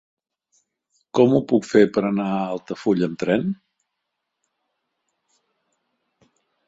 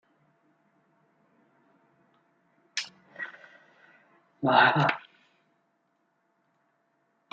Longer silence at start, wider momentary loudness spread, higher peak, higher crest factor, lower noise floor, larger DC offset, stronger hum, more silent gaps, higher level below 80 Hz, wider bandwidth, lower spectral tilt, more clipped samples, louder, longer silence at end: second, 1.15 s vs 2.75 s; second, 10 LU vs 20 LU; first, -2 dBFS vs -6 dBFS; about the same, 22 dB vs 26 dB; first, -79 dBFS vs -74 dBFS; neither; neither; neither; first, -64 dBFS vs -80 dBFS; about the same, 8 kHz vs 7.6 kHz; first, -7 dB/octave vs -2.5 dB/octave; neither; first, -21 LUFS vs -26 LUFS; first, 3.15 s vs 2.35 s